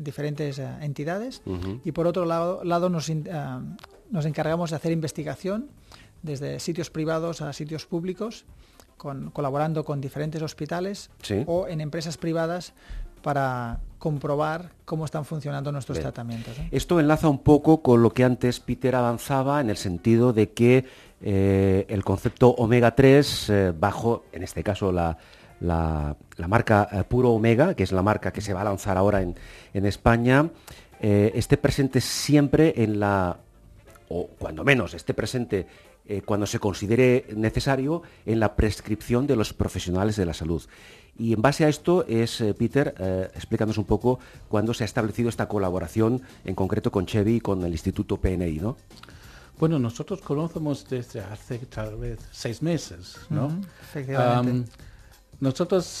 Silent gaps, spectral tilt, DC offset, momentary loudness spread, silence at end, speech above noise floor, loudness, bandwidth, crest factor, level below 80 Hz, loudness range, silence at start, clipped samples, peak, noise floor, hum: none; -6.5 dB/octave; under 0.1%; 14 LU; 0 s; 27 dB; -25 LUFS; 14 kHz; 22 dB; -42 dBFS; 9 LU; 0 s; under 0.1%; -2 dBFS; -51 dBFS; none